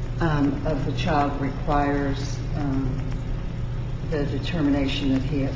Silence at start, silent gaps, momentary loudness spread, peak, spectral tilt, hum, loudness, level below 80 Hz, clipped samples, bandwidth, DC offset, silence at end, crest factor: 0 s; none; 8 LU; -8 dBFS; -7 dB/octave; none; -25 LUFS; -32 dBFS; under 0.1%; 7.6 kHz; under 0.1%; 0 s; 14 dB